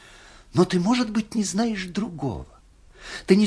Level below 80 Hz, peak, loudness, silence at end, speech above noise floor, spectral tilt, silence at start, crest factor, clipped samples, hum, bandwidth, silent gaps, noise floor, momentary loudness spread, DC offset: -50 dBFS; -4 dBFS; -24 LUFS; 0 s; 26 dB; -5.5 dB/octave; 0.55 s; 20 dB; under 0.1%; none; 11 kHz; none; -49 dBFS; 16 LU; under 0.1%